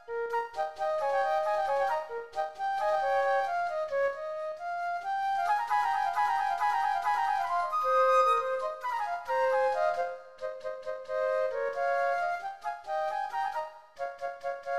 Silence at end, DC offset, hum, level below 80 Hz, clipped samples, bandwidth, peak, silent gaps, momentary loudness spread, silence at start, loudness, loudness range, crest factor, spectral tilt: 0 s; 0.2%; none; -70 dBFS; under 0.1%; 13.5 kHz; -14 dBFS; none; 10 LU; 0 s; -30 LUFS; 5 LU; 16 dB; -1.5 dB/octave